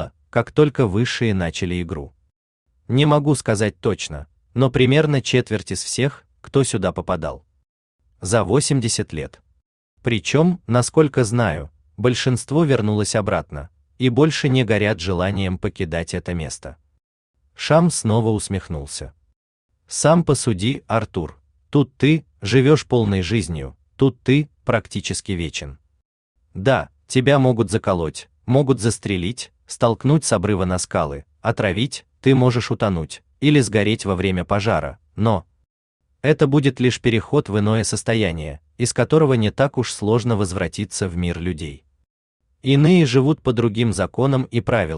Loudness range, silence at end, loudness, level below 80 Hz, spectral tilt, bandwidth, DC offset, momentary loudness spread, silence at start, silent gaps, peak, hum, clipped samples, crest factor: 3 LU; 0 s; -19 LUFS; -46 dBFS; -5.5 dB/octave; 12 kHz; under 0.1%; 12 LU; 0 s; 2.36-2.66 s, 7.69-7.99 s, 9.66-9.97 s, 17.04-17.34 s, 19.36-19.69 s, 26.05-26.35 s, 35.70-36.00 s, 42.10-42.40 s; -2 dBFS; none; under 0.1%; 16 dB